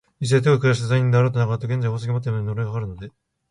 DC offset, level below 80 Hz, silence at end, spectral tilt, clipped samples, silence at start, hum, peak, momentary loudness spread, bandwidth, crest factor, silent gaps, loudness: under 0.1%; -50 dBFS; 0.4 s; -7 dB/octave; under 0.1%; 0.2 s; none; -6 dBFS; 12 LU; 10.5 kHz; 16 dB; none; -21 LUFS